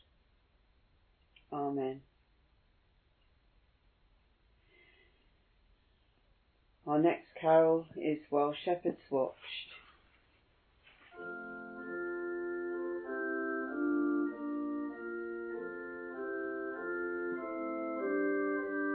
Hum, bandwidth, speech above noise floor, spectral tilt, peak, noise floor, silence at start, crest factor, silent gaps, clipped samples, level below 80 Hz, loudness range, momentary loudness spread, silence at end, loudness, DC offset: none; 4.3 kHz; 39 dB; -4.5 dB/octave; -16 dBFS; -71 dBFS; 1.5 s; 22 dB; none; under 0.1%; -74 dBFS; 12 LU; 13 LU; 0 s; -36 LUFS; under 0.1%